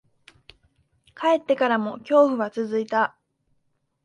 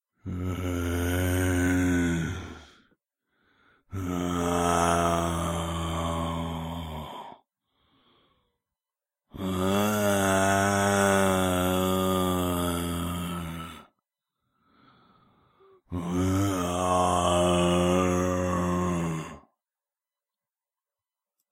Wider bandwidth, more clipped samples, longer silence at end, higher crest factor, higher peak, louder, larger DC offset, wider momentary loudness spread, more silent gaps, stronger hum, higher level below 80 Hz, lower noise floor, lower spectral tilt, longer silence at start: second, 9.2 kHz vs 16 kHz; neither; second, 0.95 s vs 2.15 s; about the same, 18 dB vs 20 dB; about the same, -6 dBFS vs -8 dBFS; first, -22 LUFS vs -26 LUFS; neither; second, 8 LU vs 13 LU; neither; neither; second, -70 dBFS vs -48 dBFS; second, -71 dBFS vs under -90 dBFS; about the same, -5.5 dB/octave vs -5 dB/octave; first, 1.2 s vs 0.25 s